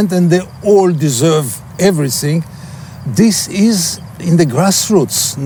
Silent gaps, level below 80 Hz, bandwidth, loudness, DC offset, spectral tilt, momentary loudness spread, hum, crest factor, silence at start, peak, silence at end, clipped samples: none; -48 dBFS; over 20 kHz; -13 LUFS; under 0.1%; -5 dB/octave; 11 LU; none; 12 dB; 0 s; 0 dBFS; 0 s; under 0.1%